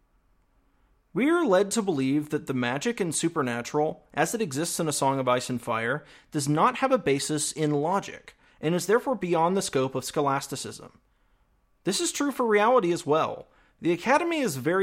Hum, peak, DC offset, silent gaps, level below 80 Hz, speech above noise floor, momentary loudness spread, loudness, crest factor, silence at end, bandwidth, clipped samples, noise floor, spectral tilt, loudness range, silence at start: none; -10 dBFS; under 0.1%; none; -64 dBFS; 41 dB; 9 LU; -26 LUFS; 18 dB; 0 s; 16.5 kHz; under 0.1%; -66 dBFS; -4.5 dB/octave; 2 LU; 1.15 s